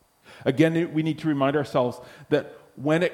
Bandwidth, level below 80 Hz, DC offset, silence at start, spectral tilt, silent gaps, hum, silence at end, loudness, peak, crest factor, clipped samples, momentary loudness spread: 13 kHz; -64 dBFS; under 0.1%; 0.3 s; -7 dB/octave; none; none; 0 s; -25 LUFS; -6 dBFS; 20 dB; under 0.1%; 9 LU